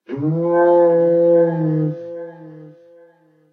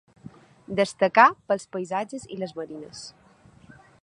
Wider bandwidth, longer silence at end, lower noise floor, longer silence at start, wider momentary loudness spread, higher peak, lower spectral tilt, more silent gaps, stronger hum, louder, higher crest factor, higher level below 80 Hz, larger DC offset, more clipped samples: second, 3.3 kHz vs 11 kHz; about the same, 0.85 s vs 0.95 s; about the same, -52 dBFS vs -54 dBFS; second, 0.1 s vs 0.7 s; second, 18 LU vs 22 LU; about the same, -4 dBFS vs -2 dBFS; first, -11.5 dB/octave vs -4.5 dB/octave; neither; neither; first, -16 LUFS vs -24 LUFS; second, 14 dB vs 24 dB; about the same, -70 dBFS vs -66 dBFS; neither; neither